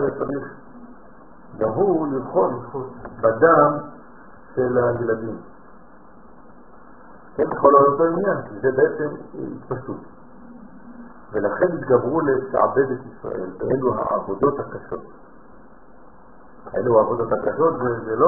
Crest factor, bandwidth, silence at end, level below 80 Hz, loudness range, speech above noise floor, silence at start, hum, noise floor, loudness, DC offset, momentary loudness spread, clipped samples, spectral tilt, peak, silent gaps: 20 dB; 2.3 kHz; 0 s; -54 dBFS; 6 LU; 28 dB; 0 s; none; -48 dBFS; -21 LUFS; 0.6%; 17 LU; under 0.1%; -10.5 dB/octave; 0 dBFS; none